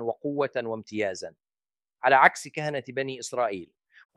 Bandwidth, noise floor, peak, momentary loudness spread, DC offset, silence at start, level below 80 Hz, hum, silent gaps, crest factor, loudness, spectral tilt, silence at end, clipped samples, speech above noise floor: 13 kHz; under -90 dBFS; -2 dBFS; 14 LU; under 0.1%; 0 s; -78 dBFS; none; none; 24 dB; -26 LUFS; -4 dB/octave; 0.5 s; under 0.1%; over 64 dB